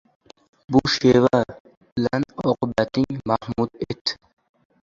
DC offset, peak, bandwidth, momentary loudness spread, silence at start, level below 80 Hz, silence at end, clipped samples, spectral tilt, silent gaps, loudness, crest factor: under 0.1%; -2 dBFS; 7.6 kHz; 10 LU; 0.7 s; -50 dBFS; 0.7 s; under 0.1%; -6 dB/octave; 1.60-1.65 s, 1.77-1.81 s, 1.92-1.96 s, 4.01-4.05 s; -22 LUFS; 20 dB